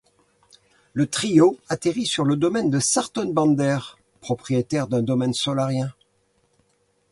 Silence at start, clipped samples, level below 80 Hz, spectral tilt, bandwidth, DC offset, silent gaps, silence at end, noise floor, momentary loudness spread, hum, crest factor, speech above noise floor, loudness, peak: 0.95 s; under 0.1%; -60 dBFS; -5 dB/octave; 11.5 kHz; under 0.1%; none; 1.2 s; -66 dBFS; 11 LU; none; 20 dB; 45 dB; -22 LUFS; -4 dBFS